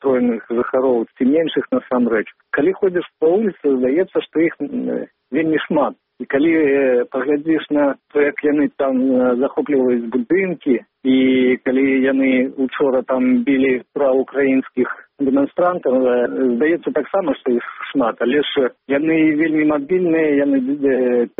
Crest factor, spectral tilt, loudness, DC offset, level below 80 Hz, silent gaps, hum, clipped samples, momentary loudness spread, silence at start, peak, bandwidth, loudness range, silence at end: 12 dB; -4.5 dB/octave; -17 LUFS; under 0.1%; -60 dBFS; none; none; under 0.1%; 5 LU; 0 s; -4 dBFS; 3.9 kHz; 2 LU; 0.1 s